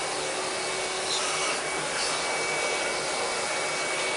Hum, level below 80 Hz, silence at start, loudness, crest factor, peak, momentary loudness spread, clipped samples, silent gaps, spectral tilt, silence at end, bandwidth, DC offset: none; -62 dBFS; 0 s; -27 LUFS; 14 dB; -16 dBFS; 3 LU; under 0.1%; none; -0.5 dB/octave; 0 s; 11 kHz; under 0.1%